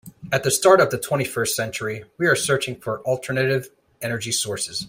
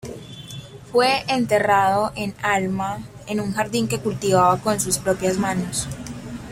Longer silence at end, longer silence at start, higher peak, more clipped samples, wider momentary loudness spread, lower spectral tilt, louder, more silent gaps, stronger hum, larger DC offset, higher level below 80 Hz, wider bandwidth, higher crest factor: about the same, 0 s vs 0 s; about the same, 0.05 s vs 0.05 s; about the same, -2 dBFS vs -4 dBFS; neither; second, 12 LU vs 17 LU; about the same, -3.5 dB/octave vs -4 dB/octave; about the same, -21 LUFS vs -21 LUFS; neither; neither; neither; second, -60 dBFS vs -48 dBFS; about the same, 16 kHz vs 16.5 kHz; about the same, 20 dB vs 18 dB